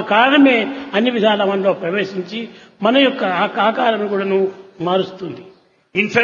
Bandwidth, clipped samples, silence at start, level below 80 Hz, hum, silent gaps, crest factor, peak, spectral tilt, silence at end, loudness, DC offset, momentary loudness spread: 7.2 kHz; under 0.1%; 0 s; -66 dBFS; none; none; 16 dB; 0 dBFS; -6 dB/octave; 0 s; -16 LUFS; under 0.1%; 14 LU